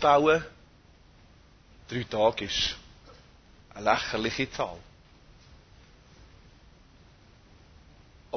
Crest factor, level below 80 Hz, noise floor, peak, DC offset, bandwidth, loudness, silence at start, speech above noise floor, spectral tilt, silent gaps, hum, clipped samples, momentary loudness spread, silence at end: 24 dB; -54 dBFS; -57 dBFS; -8 dBFS; under 0.1%; 6.6 kHz; -27 LUFS; 0 s; 30 dB; -4 dB/octave; none; none; under 0.1%; 19 LU; 0 s